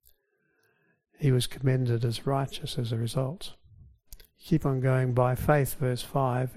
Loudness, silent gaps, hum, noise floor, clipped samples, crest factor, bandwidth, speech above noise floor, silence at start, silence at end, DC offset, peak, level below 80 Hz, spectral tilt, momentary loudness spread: -28 LUFS; none; none; -72 dBFS; under 0.1%; 20 dB; 15.5 kHz; 46 dB; 1.2 s; 0 s; under 0.1%; -10 dBFS; -50 dBFS; -6.5 dB/octave; 8 LU